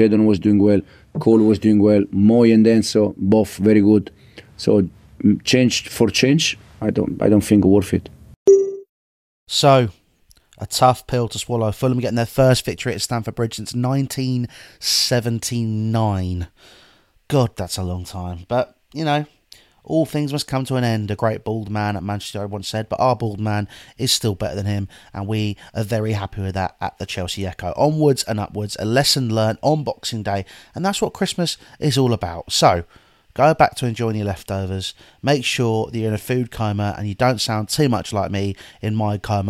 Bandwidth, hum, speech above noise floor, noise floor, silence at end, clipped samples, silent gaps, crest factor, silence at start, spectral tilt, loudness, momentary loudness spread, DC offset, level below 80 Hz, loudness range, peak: 16 kHz; none; 37 dB; -56 dBFS; 0 s; under 0.1%; 8.36-8.46 s, 8.89-9.46 s; 18 dB; 0 s; -5.5 dB/octave; -19 LUFS; 11 LU; under 0.1%; -48 dBFS; 7 LU; 0 dBFS